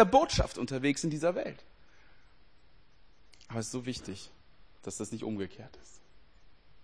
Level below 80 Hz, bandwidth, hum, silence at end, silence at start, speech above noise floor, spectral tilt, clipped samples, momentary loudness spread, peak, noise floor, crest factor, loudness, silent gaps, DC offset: -50 dBFS; 10.5 kHz; none; 1.15 s; 0 s; 33 dB; -5 dB/octave; under 0.1%; 18 LU; -8 dBFS; -64 dBFS; 26 dB; -33 LUFS; none; 0.2%